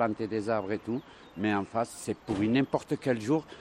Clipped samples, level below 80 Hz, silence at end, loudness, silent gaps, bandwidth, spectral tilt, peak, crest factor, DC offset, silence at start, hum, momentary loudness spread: under 0.1%; -62 dBFS; 0 s; -31 LUFS; none; 14.5 kHz; -6 dB/octave; -12 dBFS; 20 dB; under 0.1%; 0 s; none; 9 LU